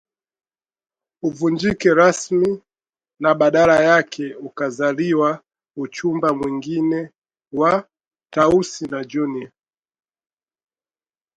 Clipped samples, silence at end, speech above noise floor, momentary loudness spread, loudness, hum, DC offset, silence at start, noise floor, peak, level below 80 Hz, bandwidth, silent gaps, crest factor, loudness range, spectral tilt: under 0.1%; 1.9 s; over 72 dB; 16 LU; -19 LUFS; none; under 0.1%; 1.25 s; under -90 dBFS; 0 dBFS; -56 dBFS; 10.5 kHz; 7.18-7.22 s; 20 dB; 5 LU; -5.5 dB/octave